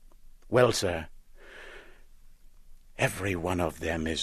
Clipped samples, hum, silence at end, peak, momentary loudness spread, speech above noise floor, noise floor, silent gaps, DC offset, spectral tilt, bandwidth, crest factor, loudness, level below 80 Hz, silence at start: under 0.1%; none; 0 s; -8 dBFS; 25 LU; 24 dB; -51 dBFS; none; under 0.1%; -4.5 dB/octave; 14 kHz; 22 dB; -28 LUFS; -48 dBFS; 0.05 s